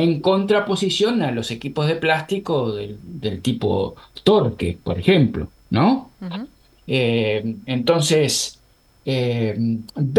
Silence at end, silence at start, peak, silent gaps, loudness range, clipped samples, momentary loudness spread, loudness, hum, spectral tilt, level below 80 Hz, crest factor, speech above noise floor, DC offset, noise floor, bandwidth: 0 s; 0 s; -4 dBFS; none; 2 LU; under 0.1%; 12 LU; -20 LUFS; none; -5.5 dB/octave; -48 dBFS; 18 dB; 35 dB; under 0.1%; -55 dBFS; 19 kHz